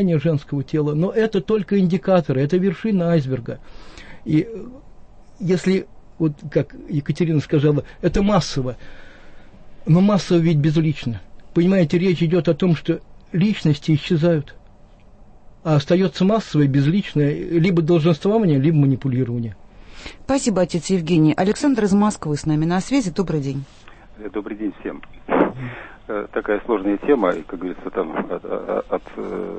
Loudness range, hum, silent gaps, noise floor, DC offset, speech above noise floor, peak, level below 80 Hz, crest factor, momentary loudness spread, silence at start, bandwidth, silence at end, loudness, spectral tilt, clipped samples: 6 LU; none; none; -46 dBFS; under 0.1%; 27 dB; -2 dBFS; -42 dBFS; 16 dB; 13 LU; 0 s; 8.8 kHz; 0 s; -20 LUFS; -7 dB/octave; under 0.1%